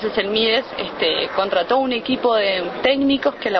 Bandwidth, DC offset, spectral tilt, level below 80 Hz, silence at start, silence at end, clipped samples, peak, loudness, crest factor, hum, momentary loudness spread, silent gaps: 6.2 kHz; under 0.1%; -6 dB/octave; -52 dBFS; 0 s; 0 s; under 0.1%; -2 dBFS; -19 LUFS; 18 dB; none; 3 LU; none